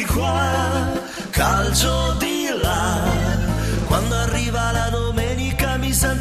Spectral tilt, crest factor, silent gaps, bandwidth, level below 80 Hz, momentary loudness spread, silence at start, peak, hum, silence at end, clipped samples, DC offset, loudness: -4.5 dB/octave; 16 dB; none; 14 kHz; -26 dBFS; 4 LU; 0 s; -4 dBFS; none; 0 s; under 0.1%; 0.1%; -20 LUFS